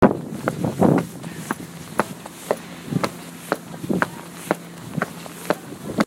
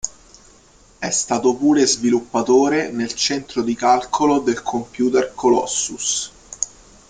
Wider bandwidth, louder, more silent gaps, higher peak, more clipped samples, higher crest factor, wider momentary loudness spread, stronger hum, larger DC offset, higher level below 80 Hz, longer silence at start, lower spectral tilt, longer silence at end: first, 16.5 kHz vs 9.6 kHz; second, -25 LUFS vs -19 LUFS; neither; about the same, -2 dBFS vs -2 dBFS; neither; first, 24 dB vs 18 dB; about the same, 13 LU vs 11 LU; neither; neither; about the same, -54 dBFS vs -54 dBFS; about the same, 0 s vs 0.05 s; first, -6 dB/octave vs -3 dB/octave; second, 0 s vs 0.45 s